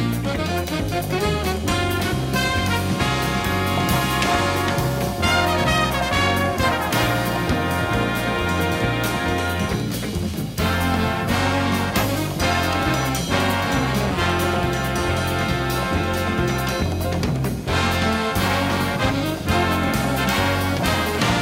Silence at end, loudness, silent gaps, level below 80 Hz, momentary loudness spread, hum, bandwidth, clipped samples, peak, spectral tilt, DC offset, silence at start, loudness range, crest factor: 0 s; -21 LUFS; none; -34 dBFS; 4 LU; none; 16.5 kHz; under 0.1%; -6 dBFS; -5 dB/octave; under 0.1%; 0 s; 2 LU; 16 dB